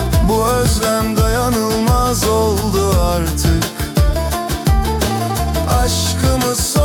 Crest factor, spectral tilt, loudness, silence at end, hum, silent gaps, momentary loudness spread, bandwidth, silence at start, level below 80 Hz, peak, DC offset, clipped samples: 12 dB; -5 dB/octave; -16 LUFS; 0 s; none; none; 4 LU; 18 kHz; 0 s; -20 dBFS; -4 dBFS; under 0.1%; under 0.1%